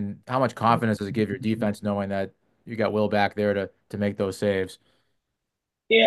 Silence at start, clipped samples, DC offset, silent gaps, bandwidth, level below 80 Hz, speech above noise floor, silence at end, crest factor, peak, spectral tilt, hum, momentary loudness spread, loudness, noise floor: 0 s; under 0.1%; under 0.1%; none; 12.5 kHz; -68 dBFS; 58 dB; 0 s; 20 dB; -6 dBFS; -6 dB/octave; none; 8 LU; -26 LUFS; -84 dBFS